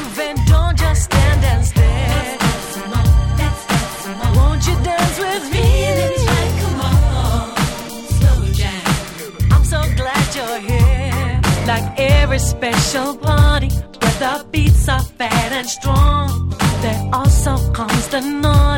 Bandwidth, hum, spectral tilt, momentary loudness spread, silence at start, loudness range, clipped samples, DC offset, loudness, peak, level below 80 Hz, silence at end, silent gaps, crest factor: 17.5 kHz; none; -5 dB/octave; 6 LU; 0 s; 2 LU; under 0.1%; under 0.1%; -16 LUFS; 0 dBFS; -20 dBFS; 0 s; none; 14 dB